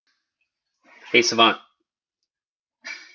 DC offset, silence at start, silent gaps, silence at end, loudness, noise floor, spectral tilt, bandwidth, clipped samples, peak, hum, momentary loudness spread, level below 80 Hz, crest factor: under 0.1%; 1.1 s; 2.47-2.64 s; 0.2 s; -18 LUFS; under -90 dBFS; -2 dB/octave; 7.6 kHz; under 0.1%; -2 dBFS; none; 21 LU; -74 dBFS; 24 dB